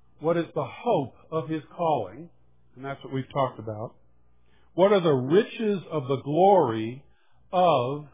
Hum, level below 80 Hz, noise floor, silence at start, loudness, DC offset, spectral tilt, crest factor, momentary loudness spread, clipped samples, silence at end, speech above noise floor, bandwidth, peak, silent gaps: none; -66 dBFS; -64 dBFS; 0.2 s; -25 LUFS; 0.1%; -11 dB/octave; 20 dB; 16 LU; under 0.1%; 0.1 s; 39 dB; 3.8 kHz; -6 dBFS; none